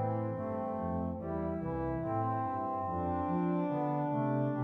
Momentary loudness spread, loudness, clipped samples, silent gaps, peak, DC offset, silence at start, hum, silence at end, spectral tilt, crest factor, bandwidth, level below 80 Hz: 4 LU; -35 LUFS; under 0.1%; none; -22 dBFS; under 0.1%; 0 s; none; 0 s; -11 dB/octave; 12 dB; 4.2 kHz; -54 dBFS